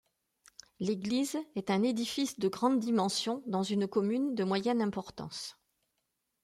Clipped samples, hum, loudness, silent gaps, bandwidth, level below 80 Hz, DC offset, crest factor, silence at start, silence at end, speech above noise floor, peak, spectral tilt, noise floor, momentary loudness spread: under 0.1%; none; -32 LUFS; none; 15.5 kHz; -72 dBFS; under 0.1%; 16 dB; 0.8 s; 0.9 s; 51 dB; -16 dBFS; -5 dB/octave; -82 dBFS; 11 LU